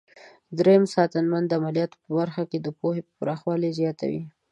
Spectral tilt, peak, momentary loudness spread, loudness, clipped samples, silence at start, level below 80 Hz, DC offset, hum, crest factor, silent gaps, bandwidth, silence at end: -7.5 dB/octave; -6 dBFS; 11 LU; -25 LUFS; under 0.1%; 0.25 s; -70 dBFS; under 0.1%; none; 18 dB; none; 10.5 kHz; 0.2 s